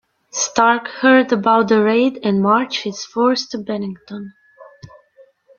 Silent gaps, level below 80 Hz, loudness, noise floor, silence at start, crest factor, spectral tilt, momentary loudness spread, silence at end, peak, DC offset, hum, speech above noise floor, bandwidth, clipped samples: none; -62 dBFS; -16 LUFS; -51 dBFS; 0.35 s; 16 dB; -4 dB/octave; 15 LU; 0.7 s; -2 dBFS; under 0.1%; none; 35 dB; 7.2 kHz; under 0.1%